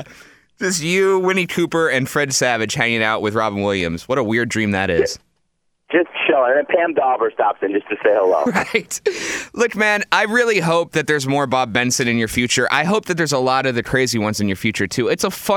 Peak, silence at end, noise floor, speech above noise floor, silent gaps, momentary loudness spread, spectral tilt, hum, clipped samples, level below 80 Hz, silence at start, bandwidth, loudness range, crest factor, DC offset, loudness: 0 dBFS; 0 s; -67 dBFS; 49 dB; none; 5 LU; -4 dB/octave; none; under 0.1%; -50 dBFS; 0 s; 19 kHz; 2 LU; 18 dB; under 0.1%; -18 LUFS